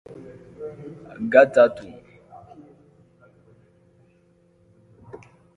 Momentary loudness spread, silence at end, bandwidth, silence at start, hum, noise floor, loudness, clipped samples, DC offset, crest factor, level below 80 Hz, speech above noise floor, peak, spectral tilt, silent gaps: 29 LU; 0.4 s; 9 kHz; 0.6 s; none; -59 dBFS; -18 LUFS; under 0.1%; under 0.1%; 24 dB; -64 dBFS; 41 dB; 0 dBFS; -6 dB/octave; none